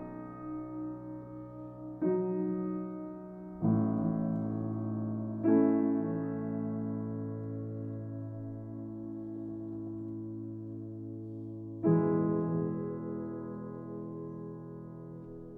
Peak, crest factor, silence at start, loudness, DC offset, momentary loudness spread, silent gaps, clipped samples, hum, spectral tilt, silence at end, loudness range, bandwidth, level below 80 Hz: -16 dBFS; 20 dB; 0 s; -35 LUFS; under 0.1%; 15 LU; none; under 0.1%; none; -13.5 dB/octave; 0 s; 10 LU; 2.8 kHz; -64 dBFS